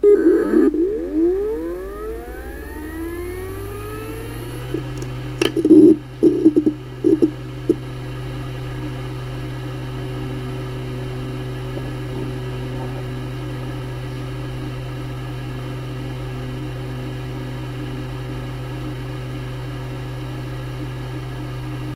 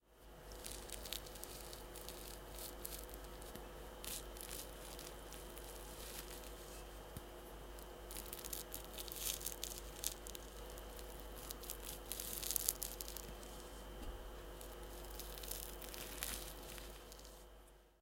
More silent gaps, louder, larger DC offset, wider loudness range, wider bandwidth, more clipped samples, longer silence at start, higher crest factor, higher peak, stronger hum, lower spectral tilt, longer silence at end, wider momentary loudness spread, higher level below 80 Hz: neither; first, -23 LUFS vs -48 LUFS; neither; first, 12 LU vs 6 LU; about the same, 16 kHz vs 17 kHz; neither; about the same, 0 s vs 0.05 s; second, 22 dB vs 42 dB; first, 0 dBFS vs -6 dBFS; neither; first, -7.5 dB/octave vs -2 dB/octave; about the same, 0 s vs 0 s; first, 14 LU vs 11 LU; first, -38 dBFS vs -56 dBFS